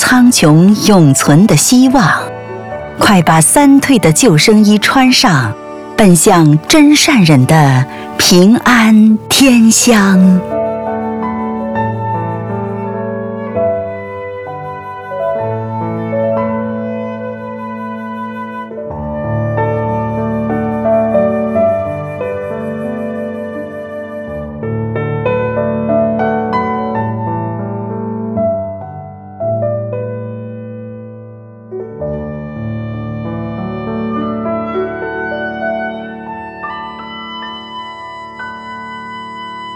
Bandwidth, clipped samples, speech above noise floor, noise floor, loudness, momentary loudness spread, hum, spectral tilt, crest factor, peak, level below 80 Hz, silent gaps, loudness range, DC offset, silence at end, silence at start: 18.5 kHz; under 0.1%; 25 dB; -32 dBFS; -11 LUFS; 18 LU; none; -4.5 dB/octave; 12 dB; 0 dBFS; -40 dBFS; none; 14 LU; under 0.1%; 0 s; 0 s